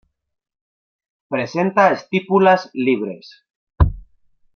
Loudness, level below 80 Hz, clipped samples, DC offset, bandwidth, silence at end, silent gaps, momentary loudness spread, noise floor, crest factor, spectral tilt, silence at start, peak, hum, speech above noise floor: -18 LUFS; -32 dBFS; under 0.1%; under 0.1%; 6.8 kHz; 0.55 s; 3.50-3.67 s; 11 LU; -55 dBFS; 18 dB; -7.5 dB/octave; 1.3 s; -2 dBFS; none; 38 dB